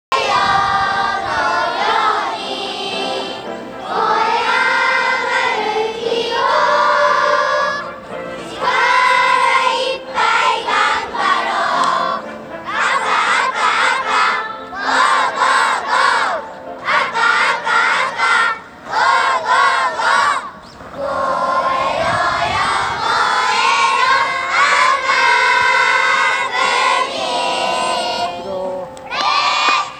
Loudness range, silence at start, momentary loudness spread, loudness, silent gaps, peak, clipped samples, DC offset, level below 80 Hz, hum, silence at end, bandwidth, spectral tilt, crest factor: 4 LU; 0.1 s; 11 LU; -15 LUFS; none; -2 dBFS; under 0.1%; under 0.1%; -52 dBFS; none; 0 s; 12.5 kHz; -1.5 dB/octave; 14 dB